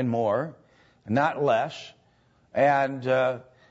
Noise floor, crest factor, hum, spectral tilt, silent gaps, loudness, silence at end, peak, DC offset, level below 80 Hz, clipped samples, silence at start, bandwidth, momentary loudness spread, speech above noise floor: -63 dBFS; 16 dB; none; -7 dB/octave; none; -25 LUFS; 0.3 s; -10 dBFS; under 0.1%; -68 dBFS; under 0.1%; 0 s; 8 kHz; 15 LU; 38 dB